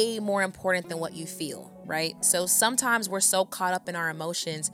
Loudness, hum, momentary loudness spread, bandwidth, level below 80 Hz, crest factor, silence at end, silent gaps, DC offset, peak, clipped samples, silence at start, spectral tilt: -26 LUFS; none; 13 LU; 17 kHz; -70 dBFS; 20 dB; 0 s; none; under 0.1%; -8 dBFS; under 0.1%; 0 s; -2 dB/octave